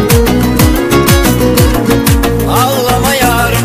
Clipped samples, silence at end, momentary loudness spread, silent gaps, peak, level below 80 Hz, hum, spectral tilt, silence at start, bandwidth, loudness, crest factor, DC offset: 0.2%; 0 s; 2 LU; none; 0 dBFS; -18 dBFS; none; -5 dB/octave; 0 s; 16 kHz; -9 LUFS; 8 dB; 0.3%